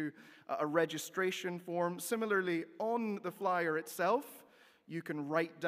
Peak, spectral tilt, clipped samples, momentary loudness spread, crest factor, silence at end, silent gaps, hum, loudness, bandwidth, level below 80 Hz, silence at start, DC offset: -18 dBFS; -4.5 dB/octave; under 0.1%; 10 LU; 20 dB; 0 s; none; none; -36 LUFS; 16 kHz; under -90 dBFS; 0 s; under 0.1%